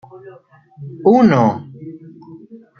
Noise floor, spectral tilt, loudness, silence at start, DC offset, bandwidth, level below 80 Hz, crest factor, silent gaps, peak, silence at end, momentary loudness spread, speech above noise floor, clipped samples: -40 dBFS; -8.5 dB/octave; -13 LUFS; 0.15 s; under 0.1%; 6.6 kHz; -58 dBFS; 16 dB; none; -2 dBFS; 0.25 s; 24 LU; 25 dB; under 0.1%